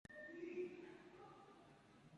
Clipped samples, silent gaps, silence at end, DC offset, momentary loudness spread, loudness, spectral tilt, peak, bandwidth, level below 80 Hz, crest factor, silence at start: under 0.1%; none; 0 s; under 0.1%; 17 LU; -54 LUFS; -6 dB/octave; -38 dBFS; 11 kHz; -84 dBFS; 18 dB; 0.1 s